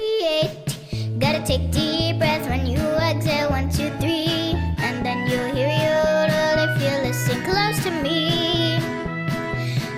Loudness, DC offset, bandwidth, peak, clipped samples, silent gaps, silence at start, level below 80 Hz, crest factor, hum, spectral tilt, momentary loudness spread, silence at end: -21 LUFS; under 0.1%; 16 kHz; -6 dBFS; under 0.1%; none; 0 s; -38 dBFS; 14 dB; none; -5 dB/octave; 6 LU; 0 s